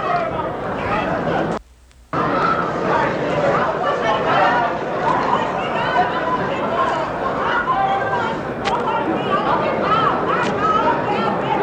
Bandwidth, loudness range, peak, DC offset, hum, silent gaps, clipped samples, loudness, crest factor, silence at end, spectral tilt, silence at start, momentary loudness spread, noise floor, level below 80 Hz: 9.8 kHz; 2 LU; -4 dBFS; under 0.1%; none; none; under 0.1%; -19 LUFS; 14 dB; 0 s; -6 dB/octave; 0 s; 5 LU; -47 dBFS; -44 dBFS